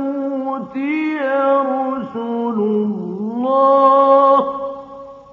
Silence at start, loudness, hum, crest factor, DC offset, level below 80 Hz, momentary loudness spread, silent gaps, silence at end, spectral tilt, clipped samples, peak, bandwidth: 0 s; -16 LUFS; none; 14 dB; under 0.1%; -64 dBFS; 13 LU; none; 0.1 s; -8.5 dB/octave; under 0.1%; -2 dBFS; 4.7 kHz